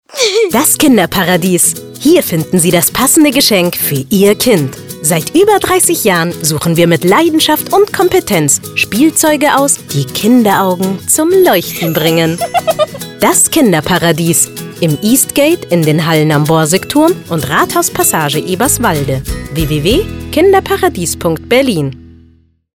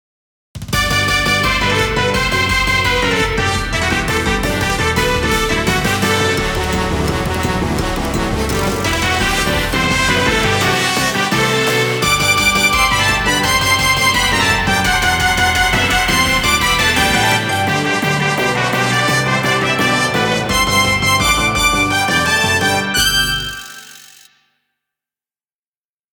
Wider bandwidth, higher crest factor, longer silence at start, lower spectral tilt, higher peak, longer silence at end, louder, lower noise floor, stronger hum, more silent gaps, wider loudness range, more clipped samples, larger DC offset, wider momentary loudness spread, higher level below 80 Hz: about the same, 19.5 kHz vs over 20 kHz; about the same, 10 dB vs 14 dB; second, 0.1 s vs 0.55 s; about the same, -4 dB/octave vs -3 dB/octave; about the same, 0 dBFS vs 0 dBFS; second, 0.7 s vs 2.1 s; first, -10 LUFS vs -14 LUFS; second, -47 dBFS vs under -90 dBFS; second, none vs 50 Hz at -45 dBFS; neither; about the same, 3 LU vs 4 LU; neither; neither; about the same, 7 LU vs 5 LU; second, -34 dBFS vs -28 dBFS